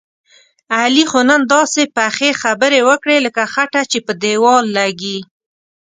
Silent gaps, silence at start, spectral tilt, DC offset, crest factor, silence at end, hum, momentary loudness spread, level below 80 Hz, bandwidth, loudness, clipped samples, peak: none; 0.7 s; -2.5 dB/octave; under 0.1%; 14 dB; 0.7 s; none; 7 LU; -62 dBFS; 9.6 kHz; -13 LUFS; under 0.1%; 0 dBFS